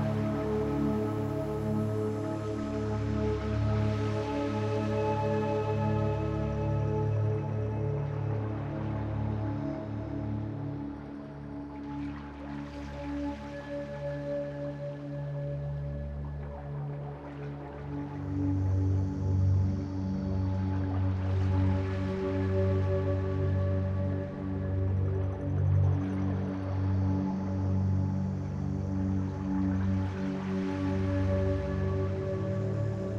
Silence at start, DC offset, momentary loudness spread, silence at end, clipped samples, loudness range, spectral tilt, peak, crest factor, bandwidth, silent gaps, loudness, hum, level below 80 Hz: 0 s; under 0.1%; 9 LU; 0 s; under 0.1%; 8 LU; -9 dB/octave; -18 dBFS; 14 dB; 7 kHz; none; -32 LUFS; none; -46 dBFS